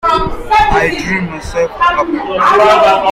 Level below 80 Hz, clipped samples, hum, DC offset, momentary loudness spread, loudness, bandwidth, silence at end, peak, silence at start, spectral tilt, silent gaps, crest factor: -28 dBFS; under 0.1%; none; under 0.1%; 10 LU; -11 LUFS; 15.5 kHz; 0 s; 0 dBFS; 0.05 s; -5 dB/octave; none; 12 dB